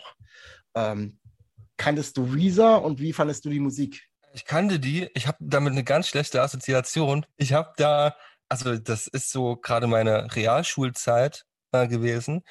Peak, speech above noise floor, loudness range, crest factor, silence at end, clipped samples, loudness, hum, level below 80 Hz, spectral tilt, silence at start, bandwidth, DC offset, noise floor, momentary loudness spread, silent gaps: -6 dBFS; 31 dB; 2 LU; 18 dB; 0.1 s; under 0.1%; -24 LUFS; none; -62 dBFS; -5.5 dB/octave; 0.05 s; 12.5 kHz; under 0.1%; -55 dBFS; 8 LU; none